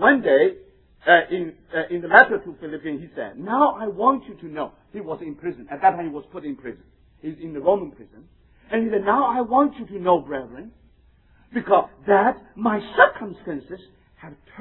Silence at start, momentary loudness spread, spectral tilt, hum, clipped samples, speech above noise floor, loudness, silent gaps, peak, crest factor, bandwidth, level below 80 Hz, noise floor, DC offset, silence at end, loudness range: 0 s; 18 LU; -9 dB/octave; none; under 0.1%; 34 dB; -21 LUFS; none; 0 dBFS; 22 dB; 4.9 kHz; -56 dBFS; -56 dBFS; under 0.1%; 0 s; 7 LU